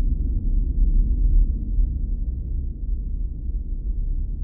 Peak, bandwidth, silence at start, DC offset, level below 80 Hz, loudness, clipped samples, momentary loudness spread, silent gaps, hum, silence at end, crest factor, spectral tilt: -8 dBFS; 0.6 kHz; 0 s; under 0.1%; -22 dBFS; -27 LUFS; under 0.1%; 8 LU; none; none; 0 s; 12 dB; -15.5 dB/octave